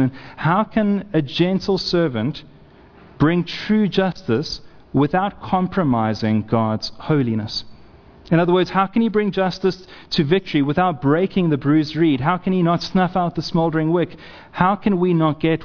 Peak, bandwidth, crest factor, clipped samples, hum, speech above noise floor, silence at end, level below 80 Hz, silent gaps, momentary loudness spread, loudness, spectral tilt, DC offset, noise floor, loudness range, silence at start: -2 dBFS; 5.4 kHz; 18 dB; under 0.1%; none; 27 dB; 0 s; -48 dBFS; none; 7 LU; -19 LUFS; -7.5 dB/octave; under 0.1%; -46 dBFS; 2 LU; 0 s